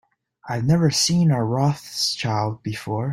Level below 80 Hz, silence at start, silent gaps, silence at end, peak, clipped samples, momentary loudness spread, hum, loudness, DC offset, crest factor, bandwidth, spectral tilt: -54 dBFS; 0.45 s; none; 0 s; -6 dBFS; under 0.1%; 9 LU; none; -21 LUFS; under 0.1%; 16 dB; 15.5 kHz; -5 dB/octave